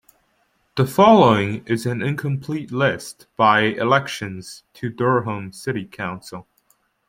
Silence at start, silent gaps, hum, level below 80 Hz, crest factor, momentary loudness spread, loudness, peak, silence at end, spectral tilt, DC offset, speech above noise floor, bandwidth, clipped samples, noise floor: 0.75 s; none; none; -58 dBFS; 18 dB; 18 LU; -19 LUFS; -2 dBFS; 0.7 s; -6 dB/octave; under 0.1%; 46 dB; 16.5 kHz; under 0.1%; -65 dBFS